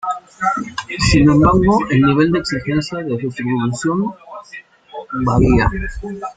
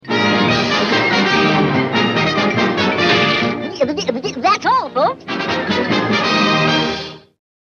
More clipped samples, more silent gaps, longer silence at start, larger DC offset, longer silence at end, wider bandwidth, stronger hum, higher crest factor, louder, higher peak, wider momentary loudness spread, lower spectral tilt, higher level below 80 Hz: neither; neither; about the same, 0.05 s vs 0.05 s; neither; second, 0.05 s vs 0.5 s; about the same, 9.4 kHz vs 9.2 kHz; neither; about the same, 16 dB vs 16 dB; about the same, -16 LUFS vs -15 LUFS; about the same, 0 dBFS vs 0 dBFS; first, 22 LU vs 7 LU; first, -6.5 dB/octave vs -5 dB/octave; first, -30 dBFS vs -50 dBFS